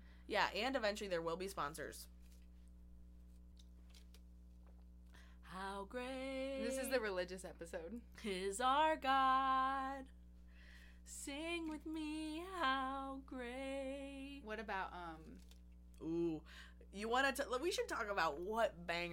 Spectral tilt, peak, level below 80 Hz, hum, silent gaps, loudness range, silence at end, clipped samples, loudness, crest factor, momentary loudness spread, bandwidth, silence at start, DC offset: -3.5 dB/octave; -20 dBFS; -60 dBFS; 60 Hz at -60 dBFS; none; 14 LU; 0 s; under 0.1%; -41 LUFS; 22 dB; 26 LU; 16.5 kHz; 0 s; under 0.1%